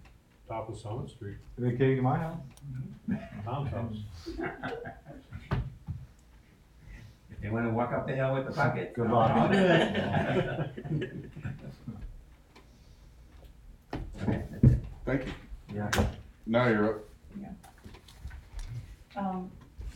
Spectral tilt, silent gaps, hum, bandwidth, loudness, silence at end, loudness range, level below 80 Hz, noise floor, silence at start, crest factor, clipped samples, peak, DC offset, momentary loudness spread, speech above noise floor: -7 dB/octave; none; none; 16.5 kHz; -31 LUFS; 0 s; 13 LU; -46 dBFS; -57 dBFS; 0 s; 22 dB; under 0.1%; -10 dBFS; under 0.1%; 22 LU; 27 dB